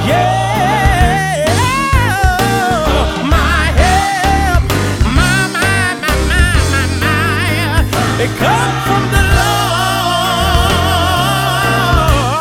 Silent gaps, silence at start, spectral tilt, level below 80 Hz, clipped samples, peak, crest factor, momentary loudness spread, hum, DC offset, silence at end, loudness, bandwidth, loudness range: none; 0 s; -4.5 dB/octave; -20 dBFS; under 0.1%; 0 dBFS; 12 dB; 3 LU; none; under 0.1%; 0 s; -12 LUFS; over 20 kHz; 1 LU